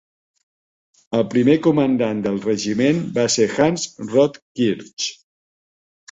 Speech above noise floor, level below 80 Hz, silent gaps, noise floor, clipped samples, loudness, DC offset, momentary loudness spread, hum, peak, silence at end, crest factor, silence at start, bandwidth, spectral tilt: over 72 dB; -58 dBFS; 4.42-4.55 s, 4.93-4.97 s; under -90 dBFS; under 0.1%; -19 LUFS; under 0.1%; 9 LU; none; -4 dBFS; 1 s; 16 dB; 1.1 s; 8.2 kHz; -5 dB/octave